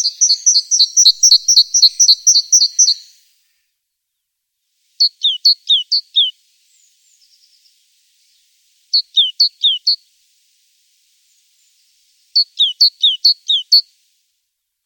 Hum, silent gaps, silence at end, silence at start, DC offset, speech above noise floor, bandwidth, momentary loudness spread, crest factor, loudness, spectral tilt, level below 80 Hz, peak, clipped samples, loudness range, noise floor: none; none; 1.05 s; 0 s; under 0.1%; 63 dB; 17.5 kHz; 8 LU; 16 dB; -10 LUFS; 10.5 dB/octave; -80 dBFS; 0 dBFS; under 0.1%; 10 LU; -75 dBFS